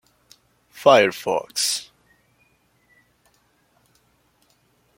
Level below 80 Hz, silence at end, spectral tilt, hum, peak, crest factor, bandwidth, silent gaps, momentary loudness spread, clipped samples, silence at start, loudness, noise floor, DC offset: -70 dBFS; 3.15 s; -2 dB/octave; none; -2 dBFS; 24 dB; 16.5 kHz; none; 10 LU; under 0.1%; 0.75 s; -19 LUFS; -63 dBFS; under 0.1%